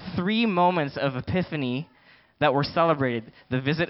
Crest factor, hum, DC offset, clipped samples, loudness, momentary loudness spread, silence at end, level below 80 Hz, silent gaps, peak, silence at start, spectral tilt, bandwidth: 18 dB; none; under 0.1%; under 0.1%; -25 LUFS; 9 LU; 0 s; -56 dBFS; none; -8 dBFS; 0 s; -10.5 dB/octave; 5.8 kHz